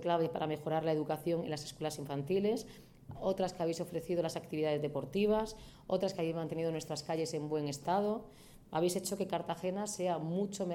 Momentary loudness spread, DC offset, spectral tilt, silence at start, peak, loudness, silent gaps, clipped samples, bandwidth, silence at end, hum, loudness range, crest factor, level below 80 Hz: 7 LU; under 0.1%; -5.5 dB/octave; 0 s; -18 dBFS; -36 LUFS; none; under 0.1%; 17.5 kHz; 0 s; none; 1 LU; 18 dB; -64 dBFS